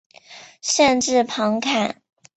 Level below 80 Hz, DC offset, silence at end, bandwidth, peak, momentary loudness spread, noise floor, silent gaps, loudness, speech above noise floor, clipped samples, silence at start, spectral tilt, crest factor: -60 dBFS; under 0.1%; 0.45 s; 8.4 kHz; -2 dBFS; 12 LU; -45 dBFS; none; -19 LUFS; 26 dB; under 0.1%; 0.3 s; -2.5 dB/octave; 18 dB